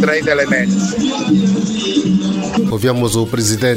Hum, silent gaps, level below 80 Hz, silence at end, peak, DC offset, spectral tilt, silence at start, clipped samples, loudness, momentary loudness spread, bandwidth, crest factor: none; none; -44 dBFS; 0 s; 0 dBFS; under 0.1%; -5 dB/octave; 0 s; under 0.1%; -15 LUFS; 3 LU; 16 kHz; 14 dB